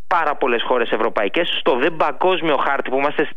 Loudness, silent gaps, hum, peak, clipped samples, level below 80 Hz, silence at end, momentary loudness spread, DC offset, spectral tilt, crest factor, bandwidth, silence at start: -19 LUFS; none; none; -6 dBFS; under 0.1%; -60 dBFS; 0.05 s; 2 LU; 5%; -6 dB/octave; 14 dB; 7.4 kHz; 0.1 s